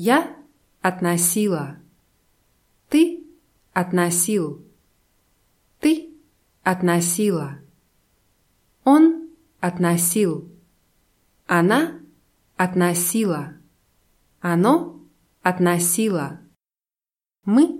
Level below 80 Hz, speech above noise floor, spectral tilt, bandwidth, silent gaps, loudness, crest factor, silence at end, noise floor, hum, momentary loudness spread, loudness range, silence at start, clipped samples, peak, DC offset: -64 dBFS; over 71 dB; -5 dB/octave; 16.5 kHz; none; -20 LUFS; 20 dB; 0 s; under -90 dBFS; none; 15 LU; 3 LU; 0 s; under 0.1%; -2 dBFS; under 0.1%